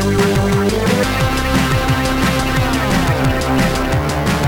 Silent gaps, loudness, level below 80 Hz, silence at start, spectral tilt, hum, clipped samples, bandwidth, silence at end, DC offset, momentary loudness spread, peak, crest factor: none; -15 LUFS; -24 dBFS; 0 s; -5.5 dB/octave; none; under 0.1%; 19 kHz; 0 s; under 0.1%; 2 LU; -4 dBFS; 12 dB